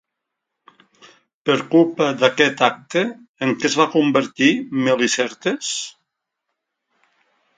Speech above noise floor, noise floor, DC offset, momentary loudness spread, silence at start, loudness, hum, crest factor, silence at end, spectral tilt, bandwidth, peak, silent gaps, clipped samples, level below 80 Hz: 62 dB; -80 dBFS; under 0.1%; 9 LU; 1.45 s; -18 LUFS; none; 20 dB; 1.7 s; -4 dB/octave; 9.4 kHz; 0 dBFS; 3.28-3.34 s; under 0.1%; -68 dBFS